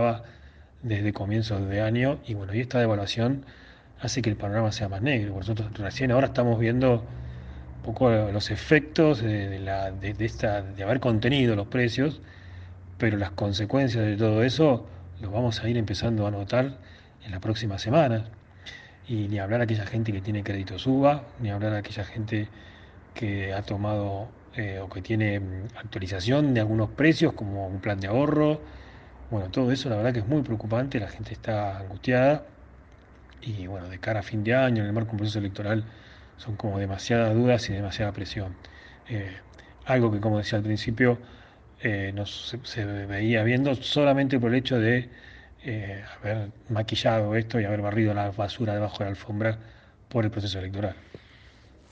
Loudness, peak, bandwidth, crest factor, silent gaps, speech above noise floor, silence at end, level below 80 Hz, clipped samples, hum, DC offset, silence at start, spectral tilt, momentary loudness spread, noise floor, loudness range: -27 LUFS; -4 dBFS; 7.8 kHz; 22 dB; none; 27 dB; 0.75 s; -50 dBFS; under 0.1%; none; under 0.1%; 0 s; -7 dB/octave; 14 LU; -53 dBFS; 4 LU